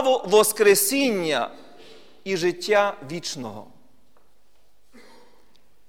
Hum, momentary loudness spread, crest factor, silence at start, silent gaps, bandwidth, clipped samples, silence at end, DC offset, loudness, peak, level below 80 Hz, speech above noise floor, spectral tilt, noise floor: none; 17 LU; 18 dB; 0 s; none; 17.5 kHz; under 0.1%; 2.25 s; 0.5%; -21 LUFS; -6 dBFS; -66 dBFS; 44 dB; -2.5 dB/octave; -65 dBFS